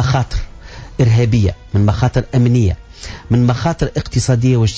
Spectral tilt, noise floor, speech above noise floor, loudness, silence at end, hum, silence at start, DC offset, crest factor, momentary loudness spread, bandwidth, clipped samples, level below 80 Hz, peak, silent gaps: -7 dB/octave; -33 dBFS; 19 dB; -15 LUFS; 0 s; none; 0 s; under 0.1%; 12 dB; 16 LU; 8 kHz; under 0.1%; -28 dBFS; -2 dBFS; none